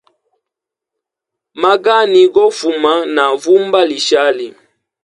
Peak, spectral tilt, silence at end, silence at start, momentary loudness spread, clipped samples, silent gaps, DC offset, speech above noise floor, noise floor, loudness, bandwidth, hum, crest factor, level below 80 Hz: 0 dBFS; -3 dB/octave; 0.55 s; 1.55 s; 7 LU; under 0.1%; none; under 0.1%; 71 dB; -82 dBFS; -12 LUFS; 11.5 kHz; none; 14 dB; -62 dBFS